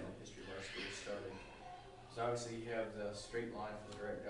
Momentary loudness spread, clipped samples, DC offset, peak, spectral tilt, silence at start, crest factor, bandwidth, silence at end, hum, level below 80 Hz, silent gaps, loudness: 12 LU; under 0.1%; under 0.1%; -28 dBFS; -4.5 dB/octave; 0 s; 18 dB; 11 kHz; 0 s; none; -64 dBFS; none; -46 LUFS